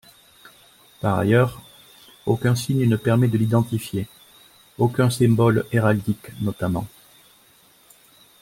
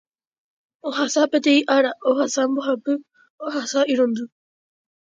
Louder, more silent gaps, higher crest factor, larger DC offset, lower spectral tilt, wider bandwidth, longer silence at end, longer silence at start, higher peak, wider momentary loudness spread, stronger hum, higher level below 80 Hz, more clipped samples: about the same, -21 LUFS vs -21 LUFS; second, none vs 3.30-3.38 s; about the same, 18 dB vs 18 dB; neither; first, -7 dB/octave vs -2.5 dB/octave; first, 16.5 kHz vs 9.2 kHz; first, 1.55 s vs 0.85 s; first, 1.05 s vs 0.85 s; about the same, -4 dBFS vs -4 dBFS; about the same, 11 LU vs 12 LU; neither; first, -54 dBFS vs -78 dBFS; neither